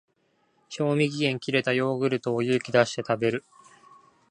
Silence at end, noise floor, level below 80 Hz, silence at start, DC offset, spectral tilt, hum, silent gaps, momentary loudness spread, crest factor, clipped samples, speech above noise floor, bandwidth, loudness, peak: 0.9 s; -69 dBFS; -70 dBFS; 0.7 s; under 0.1%; -5.5 dB/octave; none; none; 5 LU; 22 dB; under 0.1%; 44 dB; 10.5 kHz; -25 LUFS; -4 dBFS